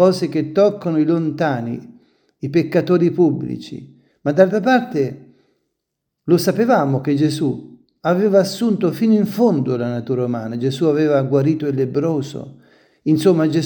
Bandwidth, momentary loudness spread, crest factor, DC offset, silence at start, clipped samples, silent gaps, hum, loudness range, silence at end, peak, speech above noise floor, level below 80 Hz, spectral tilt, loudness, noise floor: 19 kHz; 11 LU; 18 dB; under 0.1%; 0 s; under 0.1%; none; none; 2 LU; 0 s; 0 dBFS; 61 dB; -64 dBFS; -7 dB/octave; -18 LUFS; -78 dBFS